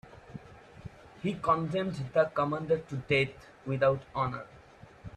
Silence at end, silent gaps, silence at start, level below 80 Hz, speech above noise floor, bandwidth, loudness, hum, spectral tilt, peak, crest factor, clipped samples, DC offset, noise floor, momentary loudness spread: 0.05 s; none; 0.05 s; -60 dBFS; 24 dB; 10.5 kHz; -30 LUFS; none; -7 dB/octave; -14 dBFS; 18 dB; under 0.1%; under 0.1%; -54 dBFS; 21 LU